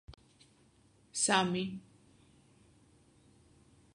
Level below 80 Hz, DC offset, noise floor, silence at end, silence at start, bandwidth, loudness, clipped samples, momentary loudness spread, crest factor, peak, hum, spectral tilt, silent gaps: -68 dBFS; under 0.1%; -66 dBFS; 2.15 s; 0.1 s; 11 kHz; -32 LUFS; under 0.1%; 15 LU; 28 dB; -12 dBFS; none; -3 dB/octave; none